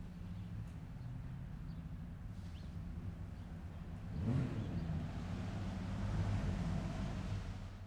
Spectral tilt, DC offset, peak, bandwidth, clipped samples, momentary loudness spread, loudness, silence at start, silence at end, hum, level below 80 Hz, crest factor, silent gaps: -7.5 dB/octave; under 0.1%; -26 dBFS; 10.5 kHz; under 0.1%; 10 LU; -44 LUFS; 0 s; 0 s; none; -50 dBFS; 18 dB; none